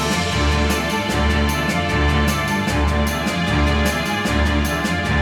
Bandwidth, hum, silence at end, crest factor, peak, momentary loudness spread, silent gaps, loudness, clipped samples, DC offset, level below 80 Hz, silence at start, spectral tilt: 19.5 kHz; none; 0 s; 14 dB; -6 dBFS; 2 LU; none; -19 LUFS; under 0.1%; under 0.1%; -24 dBFS; 0 s; -5 dB/octave